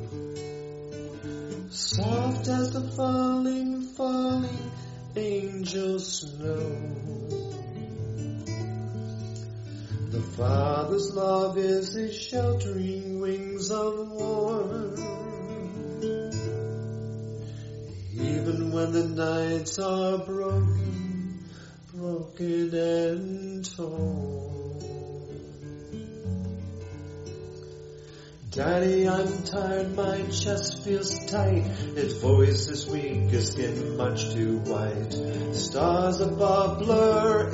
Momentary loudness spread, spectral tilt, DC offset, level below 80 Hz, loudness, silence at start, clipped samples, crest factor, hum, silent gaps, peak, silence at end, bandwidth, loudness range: 15 LU; -6 dB/octave; under 0.1%; -54 dBFS; -28 LUFS; 0 s; under 0.1%; 20 dB; none; none; -8 dBFS; 0 s; 8 kHz; 9 LU